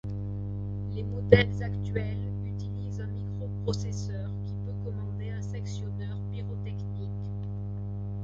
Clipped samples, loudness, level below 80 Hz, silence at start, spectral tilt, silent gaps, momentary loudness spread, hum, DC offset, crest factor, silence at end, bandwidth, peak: under 0.1%; -32 LUFS; -44 dBFS; 0.05 s; -7 dB/octave; none; 6 LU; 50 Hz at -35 dBFS; under 0.1%; 28 dB; 0 s; 7.6 kHz; -2 dBFS